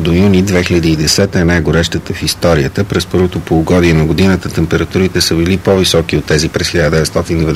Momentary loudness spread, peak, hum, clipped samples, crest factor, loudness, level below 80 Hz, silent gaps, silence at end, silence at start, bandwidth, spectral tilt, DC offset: 4 LU; 0 dBFS; none; under 0.1%; 10 dB; -11 LUFS; -28 dBFS; none; 0 s; 0 s; 16 kHz; -5 dB/octave; 0.3%